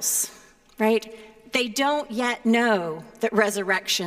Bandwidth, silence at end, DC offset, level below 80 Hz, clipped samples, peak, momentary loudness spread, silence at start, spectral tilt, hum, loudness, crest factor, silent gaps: 16 kHz; 0 s; under 0.1%; -64 dBFS; under 0.1%; -6 dBFS; 7 LU; 0 s; -2.5 dB/octave; none; -24 LUFS; 18 dB; none